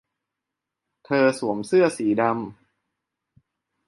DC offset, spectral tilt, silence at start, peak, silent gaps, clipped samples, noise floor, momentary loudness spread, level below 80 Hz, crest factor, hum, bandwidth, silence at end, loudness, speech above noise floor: under 0.1%; -6 dB/octave; 1.1 s; -6 dBFS; none; under 0.1%; -85 dBFS; 9 LU; -70 dBFS; 18 dB; none; 11.5 kHz; 1.35 s; -22 LUFS; 64 dB